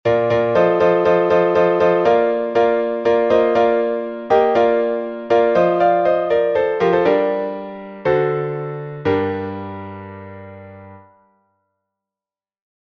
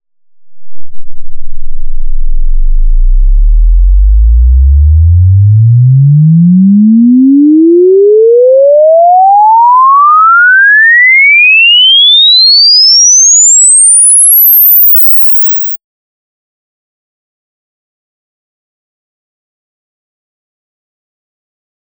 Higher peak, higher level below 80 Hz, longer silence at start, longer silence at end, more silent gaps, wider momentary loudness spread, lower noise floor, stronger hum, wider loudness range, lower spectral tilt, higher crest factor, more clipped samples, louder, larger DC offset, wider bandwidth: about the same, -2 dBFS vs 0 dBFS; second, -54 dBFS vs -12 dBFS; second, 0.05 s vs 0.45 s; second, 1.95 s vs 6.05 s; neither; first, 15 LU vs 11 LU; first, under -90 dBFS vs -35 dBFS; neither; about the same, 11 LU vs 12 LU; first, -7.5 dB/octave vs -3 dB/octave; first, 14 dB vs 4 dB; neither; second, -17 LUFS vs -2 LUFS; neither; second, 6.2 kHz vs 8.2 kHz